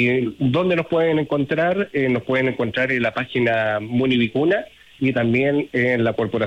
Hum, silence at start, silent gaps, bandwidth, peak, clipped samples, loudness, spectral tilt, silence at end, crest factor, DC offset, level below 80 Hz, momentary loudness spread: none; 0 s; none; 8.6 kHz; -8 dBFS; under 0.1%; -20 LUFS; -8 dB/octave; 0 s; 12 dB; under 0.1%; -56 dBFS; 3 LU